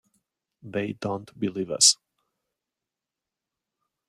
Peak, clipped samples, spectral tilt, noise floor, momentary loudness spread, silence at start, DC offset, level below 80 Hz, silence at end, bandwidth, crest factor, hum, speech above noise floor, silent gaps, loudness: -4 dBFS; under 0.1%; -2 dB/octave; -88 dBFS; 14 LU; 0.65 s; under 0.1%; -72 dBFS; 2.15 s; 15.5 kHz; 26 dB; none; 63 dB; none; -23 LUFS